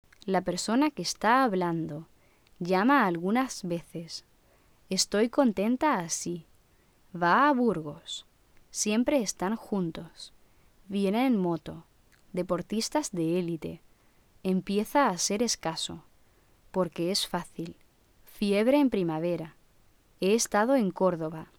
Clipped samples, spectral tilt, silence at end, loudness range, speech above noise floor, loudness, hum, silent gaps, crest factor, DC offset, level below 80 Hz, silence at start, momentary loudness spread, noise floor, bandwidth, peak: under 0.1%; -4.5 dB/octave; 0.15 s; 5 LU; 35 dB; -28 LUFS; none; none; 18 dB; under 0.1%; -62 dBFS; 0.25 s; 16 LU; -63 dBFS; 19 kHz; -10 dBFS